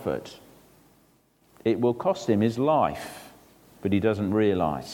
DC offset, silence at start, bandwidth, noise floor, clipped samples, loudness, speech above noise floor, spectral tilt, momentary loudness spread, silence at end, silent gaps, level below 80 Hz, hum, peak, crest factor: under 0.1%; 0 s; 18.5 kHz; -63 dBFS; under 0.1%; -25 LUFS; 38 dB; -7 dB/octave; 14 LU; 0 s; none; -58 dBFS; none; -10 dBFS; 16 dB